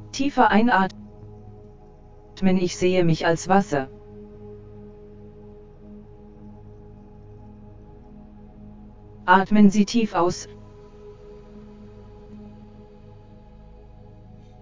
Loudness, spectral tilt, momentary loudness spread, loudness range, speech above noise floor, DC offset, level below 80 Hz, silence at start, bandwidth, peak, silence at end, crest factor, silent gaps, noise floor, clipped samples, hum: -20 LUFS; -6 dB/octave; 28 LU; 23 LU; 28 dB; under 0.1%; -48 dBFS; 0 s; 7.6 kHz; -2 dBFS; 0.05 s; 24 dB; none; -46 dBFS; under 0.1%; none